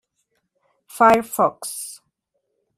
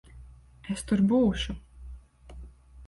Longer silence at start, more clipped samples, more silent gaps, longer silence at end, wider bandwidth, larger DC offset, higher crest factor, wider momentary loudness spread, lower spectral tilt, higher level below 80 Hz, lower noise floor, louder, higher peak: first, 0.95 s vs 0.15 s; neither; neither; first, 0.85 s vs 0 s; first, 15.5 kHz vs 11.5 kHz; neither; about the same, 20 dB vs 16 dB; second, 19 LU vs 25 LU; second, -3.5 dB/octave vs -6 dB/octave; second, -60 dBFS vs -44 dBFS; first, -74 dBFS vs -50 dBFS; first, -18 LUFS vs -27 LUFS; first, -2 dBFS vs -14 dBFS